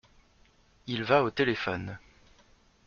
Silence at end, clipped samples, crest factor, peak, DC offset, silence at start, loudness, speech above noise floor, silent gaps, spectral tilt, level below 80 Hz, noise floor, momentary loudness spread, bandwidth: 0.9 s; under 0.1%; 24 dB; -8 dBFS; under 0.1%; 0.85 s; -28 LUFS; 35 dB; none; -3.5 dB/octave; -62 dBFS; -63 dBFS; 20 LU; 7.2 kHz